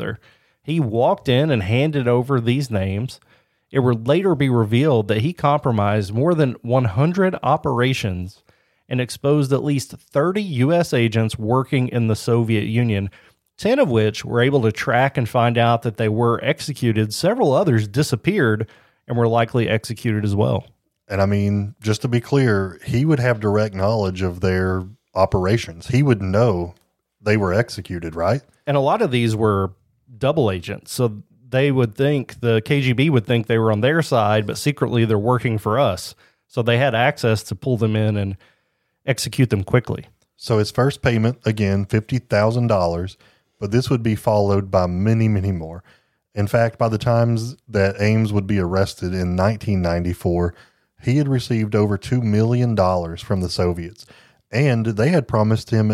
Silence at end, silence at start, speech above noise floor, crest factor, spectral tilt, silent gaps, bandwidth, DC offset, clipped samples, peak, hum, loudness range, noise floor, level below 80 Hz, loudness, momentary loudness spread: 0 s; 0 s; 51 dB; 18 dB; -7 dB/octave; none; 14 kHz; under 0.1%; under 0.1%; -2 dBFS; none; 3 LU; -69 dBFS; -48 dBFS; -19 LUFS; 7 LU